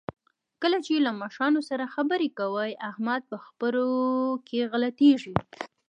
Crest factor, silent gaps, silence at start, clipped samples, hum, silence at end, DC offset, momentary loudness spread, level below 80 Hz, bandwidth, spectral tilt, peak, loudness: 22 dB; none; 0.6 s; under 0.1%; none; 0.2 s; under 0.1%; 10 LU; -60 dBFS; 9.8 kHz; -6 dB/octave; -4 dBFS; -27 LUFS